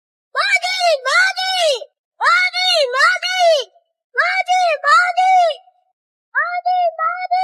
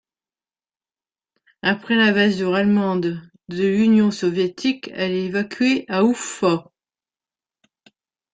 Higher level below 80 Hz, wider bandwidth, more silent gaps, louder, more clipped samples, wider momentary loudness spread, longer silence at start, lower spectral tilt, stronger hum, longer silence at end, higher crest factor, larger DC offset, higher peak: second, under -90 dBFS vs -62 dBFS; first, 13.5 kHz vs 9.4 kHz; first, 1.98-2.11 s, 4.04-4.10 s, 5.93-6.32 s vs none; first, -15 LUFS vs -20 LUFS; neither; about the same, 8 LU vs 8 LU; second, 0.35 s vs 1.65 s; second, 6 dB/octave vs -5.5 dB/octave; neither; second, 0 s vs 1.7 s; about the same, 16 dB vs 18 dB; neither; first, 0 dBFS vs -4 dBFS